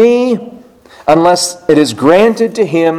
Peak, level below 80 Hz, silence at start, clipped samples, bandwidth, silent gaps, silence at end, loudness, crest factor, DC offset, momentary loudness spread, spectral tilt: 0 dBFS; -50 dBFS; 0 s; 0.6%; 15.5 kHz; none; 0 s; -10 LUFS; 10 dB; under 0.1%; 7 LU; -4.5 dB/octave